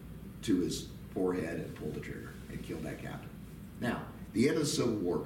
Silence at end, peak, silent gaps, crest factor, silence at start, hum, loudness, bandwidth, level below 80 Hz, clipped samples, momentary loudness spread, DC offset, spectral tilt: 0 s; -18 dBFS; none; 18 dB; 0 s; none; -35 LUFS; 17 kHz; -54 dBFS; under 0.1%; 14 LU; under 0.1%; -5.5 dB/octave